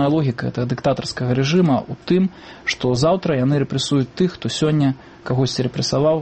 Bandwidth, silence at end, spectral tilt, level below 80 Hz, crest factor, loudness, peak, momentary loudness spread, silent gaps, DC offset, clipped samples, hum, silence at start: 8.8 kHz; 0 s; -6 dB/octave; -48 dBFS; 14 dB; -20 LUFS; -6 dBFS; 6 LU; none; under 0.1%; under 0.1%; none; 0 s